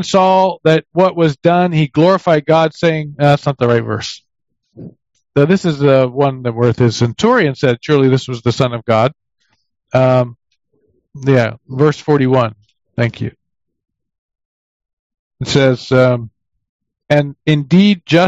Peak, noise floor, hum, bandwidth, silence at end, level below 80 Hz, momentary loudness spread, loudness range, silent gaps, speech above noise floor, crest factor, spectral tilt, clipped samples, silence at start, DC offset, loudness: 0 dBFS; -61 dBFS; none; 8 kHz; 0 s; -50 dBFS; 8 LU; 5 LU; 14.18-14.29 s, 14.45-14.80 s, 14.93-15.10 s, 15.19-15.31 s, 16.69-16.79 s; 48 dB; 14 dB; -7 dB/octave; under 0.1%; 0 s; under 0.1%; -13 LUFS